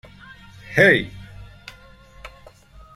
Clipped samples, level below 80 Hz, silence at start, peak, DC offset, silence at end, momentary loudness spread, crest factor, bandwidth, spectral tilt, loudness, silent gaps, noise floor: under 0.1%; -48 dBFS; 0.7 s; 0 dBFS; under 0.1%; 0.65 s; 28 LU; 24 dB; 15 kHz; -5.5 dB/octave; -17 LUFS; none; -47 dBFS